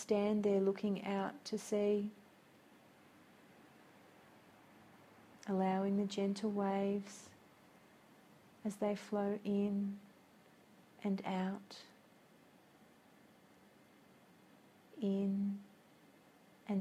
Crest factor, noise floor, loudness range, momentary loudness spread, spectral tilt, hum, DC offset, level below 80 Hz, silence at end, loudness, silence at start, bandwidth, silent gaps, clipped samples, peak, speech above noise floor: 20 dB; -65 dBFS; 7 LU; 18 LU; -7 dB/octave; none; under 0.1%; -82 dBFS; 0 s; -38 LUFS; 0 s; 13 kHz; none; under 0.1%; -22 dBFS; 28 dB